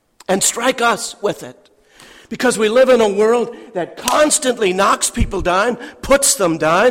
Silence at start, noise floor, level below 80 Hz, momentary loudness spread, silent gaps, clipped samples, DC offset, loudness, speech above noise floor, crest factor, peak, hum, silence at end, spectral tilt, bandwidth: 0.3 s; -46 dBFS; -36 dBFS; 11 LU; none; under 0.1%; under 0.1%; -15 LUFS; 31 dB; 14 dB; -2 dBFS; none; 0 s; -3 dB/octave; 16.5 kHz